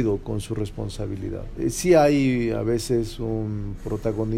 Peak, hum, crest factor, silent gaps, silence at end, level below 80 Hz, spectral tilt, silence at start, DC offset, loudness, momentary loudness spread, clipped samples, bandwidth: -4 dBFS; none; 18 dB; none; 0 s; -38 dBFS; -6 dB/octave; 0 s; under 0.1%; -24 LUFS; 13 LU; under 0.1%; 16 kHz